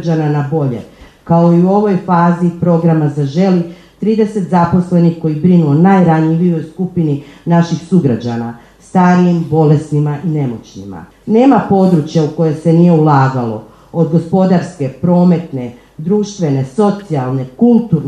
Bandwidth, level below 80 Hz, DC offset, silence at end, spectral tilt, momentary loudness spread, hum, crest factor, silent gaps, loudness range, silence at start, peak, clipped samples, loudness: 9 kHz; -48 dBFS; under 0.1%; 0 s; -9 dB/octave; 12 LU; none; 12 dB; none; 3 LU; 0 s; 0 dBFS; under 0.1%; -12 LUFS